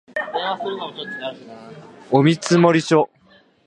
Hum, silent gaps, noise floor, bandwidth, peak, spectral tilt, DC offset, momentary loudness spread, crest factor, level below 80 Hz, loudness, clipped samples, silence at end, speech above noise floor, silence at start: none; none; -54 dBFS; 11 kHz; 0 dBFS; -6 dB/octave; under 0.1%; 18 LU; 20 dB; -66 dBFS; -19 LUFS; under 0.1%; 0.6 s; 35 dB; 0.15 s